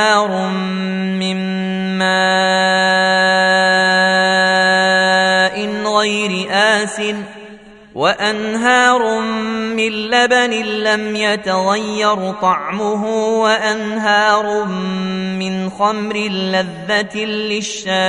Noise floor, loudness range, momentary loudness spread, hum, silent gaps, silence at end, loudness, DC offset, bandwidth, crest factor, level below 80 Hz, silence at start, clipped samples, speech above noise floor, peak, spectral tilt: -39 dBFS; 5 LU; 8 LU; none; none; 0 s; -15 LUFS; under 0.1%; 11 kHz; 16 dB; -56 dBFS; 0 s; under 0.1%; 22 dB; 0 dBFS; -4 dB/octave